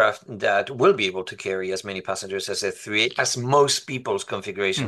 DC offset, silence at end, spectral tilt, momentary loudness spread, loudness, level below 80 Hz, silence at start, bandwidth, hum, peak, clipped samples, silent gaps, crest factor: under 0.1%; 0 s; -3 dB/octave; 10 LU; -23 LUFS; -68 dBFS; 0 s; 12.5 kHz; none; -6 dBFS; under 0.1%; none; 18 dB